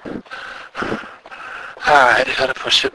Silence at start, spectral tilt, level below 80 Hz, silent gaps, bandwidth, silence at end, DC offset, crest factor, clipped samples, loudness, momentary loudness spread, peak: 0.05 s; -2 dB/octave; -50 dBFS; none; 11 kHz; 0.05 s; under 0.1%; 18 dB; under 0.1%; -15 LUFS; 20 LU; 0 dBFS